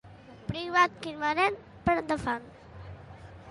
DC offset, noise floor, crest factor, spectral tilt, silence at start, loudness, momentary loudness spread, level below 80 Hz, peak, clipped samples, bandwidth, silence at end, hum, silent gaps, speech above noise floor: under 0.1%; -48 dBFS; 22 dB; -5 dB/octave; 0.05 s; -29 LUFS; 23 LU; -54 dBFS; -10 dBFS; under 0.1%; 11.5 kHz; 0 s; none; none; 20 dB